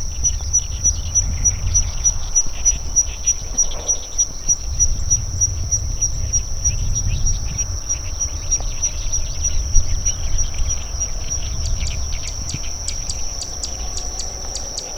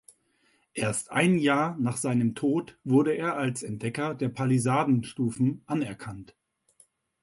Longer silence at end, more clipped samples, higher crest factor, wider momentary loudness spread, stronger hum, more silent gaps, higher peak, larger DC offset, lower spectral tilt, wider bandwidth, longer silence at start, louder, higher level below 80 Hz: second, 0 s vs 1 s; neither; about the same, 20 dB vs 18 dB; about the same, 9 LU vs 9 LU; neither; neither; first, 0 dBFS vs -10 dBFS; neither; second, -1.5 dB/octave vs -6 dB/octave; about the same, 12.5 kHz vs 11.5 kHz; second, 0 s vs 0.75 s; first, -20 LUFS vs -27 LUFS; first, -24 dBFS vs -64 dBFS